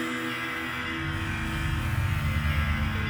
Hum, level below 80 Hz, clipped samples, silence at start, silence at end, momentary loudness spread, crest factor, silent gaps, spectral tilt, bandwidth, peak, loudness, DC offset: none; -34 dBFS; under 0.1%; 0 s; 0 s; 3 LU; 14 dB; none; -5.5 dB/octave; over 20 kHz; -14 dBFS; -29 LUFS; under 0.1%